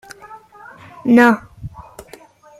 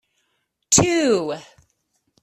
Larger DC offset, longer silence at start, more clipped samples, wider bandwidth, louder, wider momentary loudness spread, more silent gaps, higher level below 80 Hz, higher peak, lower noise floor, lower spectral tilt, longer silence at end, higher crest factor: neither; second, 0.3 s vs 0.7 s; neither; about the same, 13.5 kHz vs 14.5 kHz; first, -14 LUFS vs -18 LUFS; first, 26 LU vs 15 LU; neither; about the same, -48 dBFS vs -52 dBFS; about the same, -2 dBFS vs -2 dBFS; second, -44 dBFS vs -72 dBFS; first, -6 dB/octave vs -3 dB/octave; about the same, 0.8 s vs 0.8 s; about the same, 18 dB vs 20 dB